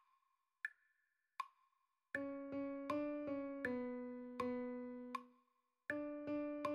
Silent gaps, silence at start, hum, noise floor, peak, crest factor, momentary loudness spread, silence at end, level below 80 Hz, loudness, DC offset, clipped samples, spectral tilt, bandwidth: none; 0.65 s; none; -85 dBFS; -28 dBFS; 18 dB; 9 LU; 0 s; -80 dBFS; -47 LUFS; under 0.1%; under 0.1%; -6 dB/octave; 12.5 kHz